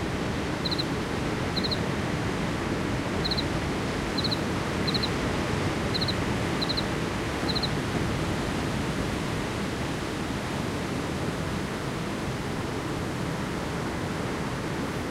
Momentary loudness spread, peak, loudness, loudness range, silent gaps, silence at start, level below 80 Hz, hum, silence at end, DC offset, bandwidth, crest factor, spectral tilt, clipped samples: 4 LU; -14 dBFS; -29 LUFS; 3 LU; none; 0 s; -42 dBFS; none; 0 s; under 0.1%; 16 kHz; 16 dB; -5 dB/octave; under 0.1%